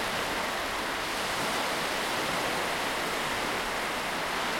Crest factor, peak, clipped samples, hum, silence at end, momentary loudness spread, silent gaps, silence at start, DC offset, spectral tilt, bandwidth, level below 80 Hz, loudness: 14 dB; -16 dBFS; under 0.1%; none; 0 s; 2 LU; none; 0 s; under 0.1%; -2 dB/octave; 16.5 kHz; -54 dBFS; -29 LUFS